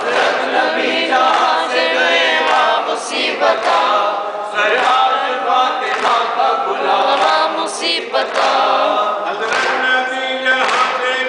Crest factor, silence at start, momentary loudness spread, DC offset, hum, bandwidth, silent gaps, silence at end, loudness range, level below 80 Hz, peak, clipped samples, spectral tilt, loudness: 14 dB; 0 s; 5 LU; under 0.1%; none; 10.5 kHz; none; 0 s; 1 LU; -66 dBFS; -2 dBFS; under 0.1%; -1 dB/octave; -14 LUFS